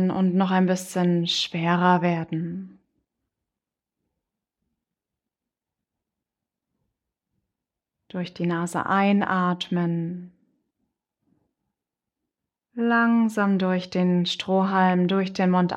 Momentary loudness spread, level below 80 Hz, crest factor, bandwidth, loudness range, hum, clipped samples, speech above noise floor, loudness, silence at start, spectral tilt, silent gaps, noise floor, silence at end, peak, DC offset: 10 LU; -70 dBFS; 20 dB; 12 kHz; 13 LU; none; under 0.1%; 65 dB; -23 LUFS; 0 s; -6 dB/octave; none; -88 dBFS; 0 s; -6 dBFS; under 0.1%